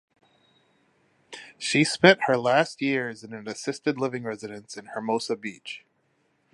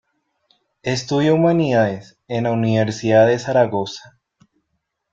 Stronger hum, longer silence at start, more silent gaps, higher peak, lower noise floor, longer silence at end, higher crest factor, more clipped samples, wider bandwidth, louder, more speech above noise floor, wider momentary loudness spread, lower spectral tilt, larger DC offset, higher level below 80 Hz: neither; first, 1.3 s vs 0.85 s; neither; about the same, -2 dBFS vs -2 dBFS; second, -70 dBFS vs -74 dBFS; second, 0.75 s vs 1.15 s; first, 26 dB vs 16 dB; neither; first, 11.5 kHz vs 7.8 kHz; second, -24 LUFS vs -18 LUFS; second, 44 dB vs 57 dB; first, 21 LU vs 14 LU; second, -4.5 dB/octave vs -6.5 dB/octave; neither; second, -72 dBFS vs -58 dBFS